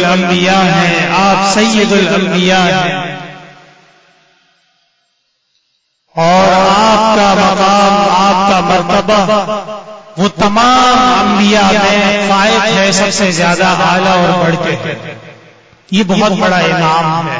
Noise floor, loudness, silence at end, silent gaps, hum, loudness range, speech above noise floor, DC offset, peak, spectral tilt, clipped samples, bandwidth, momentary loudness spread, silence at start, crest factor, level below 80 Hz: -62 dBFS; -9 LUFS; 0 s; none; none; 7 LU; 53 dB; under 0.1%; 0 dBFS; -4.5 dB/octave; under 0.1%; 8 kHz; 9 LU; 0 s; 10 dB; -40 dBFS